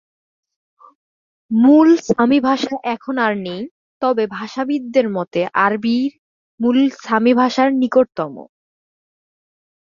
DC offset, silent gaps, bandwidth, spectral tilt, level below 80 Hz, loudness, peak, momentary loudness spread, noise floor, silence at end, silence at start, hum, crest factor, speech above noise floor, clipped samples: under 0.1%; 3.71-4.01 s, 6.19-6.58 s; 7.4 kHz; -6 dB/octave; -62 dBFS; -17 LUFS; -2 dBFS; 12 LU; under -90 dBFS; 1.5 s; 1.5 s; none; 16 dB; over 74 dB; under 0.1%